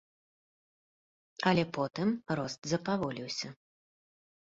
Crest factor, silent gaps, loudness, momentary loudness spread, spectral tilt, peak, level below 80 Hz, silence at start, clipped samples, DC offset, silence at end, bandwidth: 24 dB; 2.58-2.62 s; -33 LUFS; 9 LU; -5.5 dB/octave; -10 dBFS; -68 dBFS; 1.4 s; under 0.1%; under 0.1%; 0.95 s; 7.8 kHz